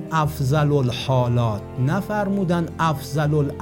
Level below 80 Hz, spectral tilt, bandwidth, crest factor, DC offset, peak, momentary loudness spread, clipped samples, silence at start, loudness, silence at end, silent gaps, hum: -44 dBFS; -7 dB/octave; 17 kHz; 14 dB; under 0.1%; -6 dBFS; 4 LU; under 0.1%; 0 s; -21 LUFS; 0 s; none; none